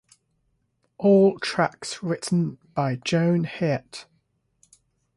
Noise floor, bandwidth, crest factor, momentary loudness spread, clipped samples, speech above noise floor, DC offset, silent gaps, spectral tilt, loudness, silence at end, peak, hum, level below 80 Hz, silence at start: -71 dBFS; 11.5 kHz; 18 dB; 12 LU; under 0.1%; 49 dB; under 0.1%; none; -6 dB/octave; -23 LUFS; 1.15 s; -8 dBFS; none; -64 dBFS; 1 s